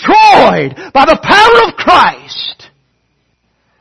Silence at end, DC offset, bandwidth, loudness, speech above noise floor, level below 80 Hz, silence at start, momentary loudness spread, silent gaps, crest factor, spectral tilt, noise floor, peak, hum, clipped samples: 1.25 s; under 0.1%; 12 kHz; -7 LUFS; 52 dB; -40 dBFS; 0 s; 15 LU; none; 8 dB; -4 dB/octave; -60 dBFS; 0 dBFS; none; 2%